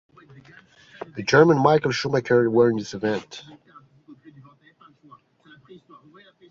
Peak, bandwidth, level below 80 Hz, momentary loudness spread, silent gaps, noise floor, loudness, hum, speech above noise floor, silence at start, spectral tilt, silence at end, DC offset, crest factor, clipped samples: -2 dBFS; 7.6 kHz; -62 dBFS; 22 LU; none; -55 dBFS; -20 LUFS; none; 35 dB; 1.15 s; -6 dB/octave; 2.4 s; under 0.1%; 22 dB; under 0.1%